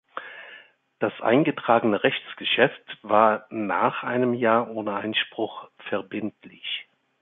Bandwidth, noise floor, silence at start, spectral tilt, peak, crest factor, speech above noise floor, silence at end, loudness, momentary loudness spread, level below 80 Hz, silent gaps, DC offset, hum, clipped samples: 4.1 kHz; -51 dBFS; 0.15 s; -9.5 dB/octave; -2 dBFS; 22 dB; 27 dB; 0.4 s; -24 LUFS; 17 LU; -70 dBFS; none; under 0.1%; none; under 0.1%